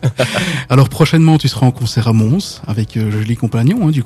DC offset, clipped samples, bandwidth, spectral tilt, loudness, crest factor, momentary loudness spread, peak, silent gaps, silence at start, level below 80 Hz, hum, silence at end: under 0.1%; 0.4%; 14 kHz; -6.5 dB/octave; -14 LUFS; 12 dB; 7 LU; 0 dBFS; none; 0 s; -42 dBFS; none; 0 s